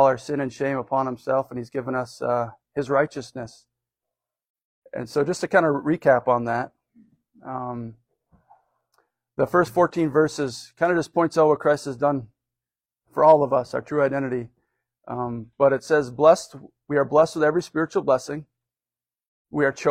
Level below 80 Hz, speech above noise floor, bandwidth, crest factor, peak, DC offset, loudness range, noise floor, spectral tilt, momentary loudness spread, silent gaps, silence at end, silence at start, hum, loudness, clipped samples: -62 dBFS; over 68 dB; 15 kHz; 20 dB; -4 dBFS; under 0.1%; 7 LU; under -90 dBFS; -6 dB/octave; 16 LU; 4.49-4.55 s, 4.64-4.82 s, 19.27-19.45 s; 0 s; 0 s; none; -22 LUFS; under 0.1%